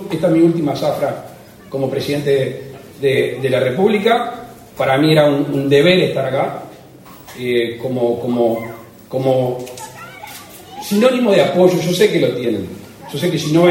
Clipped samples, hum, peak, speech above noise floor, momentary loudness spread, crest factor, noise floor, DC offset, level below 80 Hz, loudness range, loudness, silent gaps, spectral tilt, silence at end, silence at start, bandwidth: under 0.1%; none; 0 dBFS; 25 dB; 20 LU; 16 dB; -39 dBFS; under 0.1%; -56 dBFS; 5 LU; -16 LUFS; none; -6 dB/octave; 0 s; 0 s; 16.5 kHz